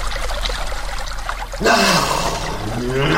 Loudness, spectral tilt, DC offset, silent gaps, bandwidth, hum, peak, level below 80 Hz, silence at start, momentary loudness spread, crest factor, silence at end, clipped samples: -19 LUFS; -3.5 dB/octave; under 0.1%; none; 16.5 kHz; none; 0 dBFS; -26 dBFS; 0 s; 13 LU; 18 dB; 0 s; under 0.1%